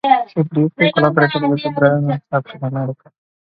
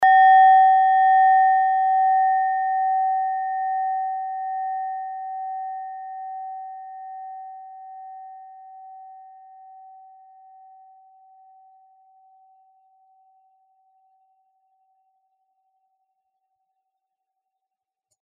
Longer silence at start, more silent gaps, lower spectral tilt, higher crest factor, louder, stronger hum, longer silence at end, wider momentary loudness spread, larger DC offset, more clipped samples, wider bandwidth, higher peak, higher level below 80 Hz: about the same, 0.05 s vs 0 s; neither; first, -9.5 dB/octave vs 11.5 dB/octave; about the same, 16 dB vs 16 dB; about the same, -17 LUFS vs -19 LUFS; neither; second, 0.55 s vs 9.05 s; second, 10 LU vs 26 LU; neither; neither; first, 5.2 kHz vs 3.5 kHz; first, 0 dBFS vs -6 dBFS; first, -60 dBFS vs -90 dBFS